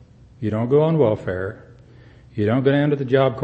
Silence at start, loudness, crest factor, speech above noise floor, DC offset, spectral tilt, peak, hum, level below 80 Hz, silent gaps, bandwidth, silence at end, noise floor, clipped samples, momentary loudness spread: 0.4 s; -20 LUFS; 16 dB; 28 dB; under 0.1%; -9.5 dB/octave; -4 dBFS; none; -52 dBFS; none; 5.2 kHz; 0 s; -46 dBFS; under 0.1%; 11 LU